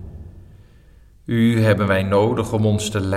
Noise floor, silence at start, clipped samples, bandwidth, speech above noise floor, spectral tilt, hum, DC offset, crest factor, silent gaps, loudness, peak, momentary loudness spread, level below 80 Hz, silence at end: -48 dBFS; 0 s; under 0.1%; 14.5 kHz; 31 dB; -6.5 dB/octave; none; under 0.1%; 16 dB; none; -18 LUFS; -4 dBFS; 10 LU; -44 dBFS; 0 s